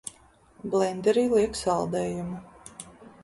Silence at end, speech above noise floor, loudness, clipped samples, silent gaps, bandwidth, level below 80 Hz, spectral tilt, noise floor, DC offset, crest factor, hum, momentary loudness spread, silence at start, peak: 0.15 s; 32 dB; -26 LUFS; under 0.1%; none; 11.5 kHz; -56 dBFS; -5.5 dB/octave; -57 dBFS; under 0.1%; 18 dB; none; 21 LU; 0.05 s; -10 dBFS